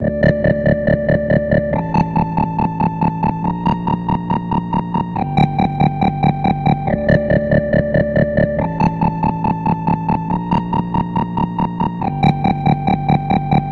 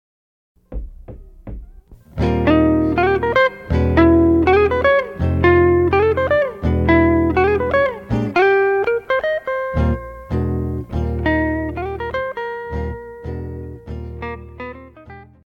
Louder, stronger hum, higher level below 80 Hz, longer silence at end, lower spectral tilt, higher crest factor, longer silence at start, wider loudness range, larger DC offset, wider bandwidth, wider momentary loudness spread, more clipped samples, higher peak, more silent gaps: about the same, -17 LUFS vs -17 LUFS; neither; about the same, -32 dBFS vs -30 dBFS; second, 0 s vs 0.2 s; about the same, -9.5 dB/octave vs -9 dB/octave; about the same, 14 dB vs 16 dB; second, 0 s vs 0.7 s; second, 2 LU vs 9 LU; neither; about the same, 6.4 kHz vs 6.6 kHz; second, 4 LU vs 19 LU; neither; about the same, -2 dBFS vs -2 dBFS; neither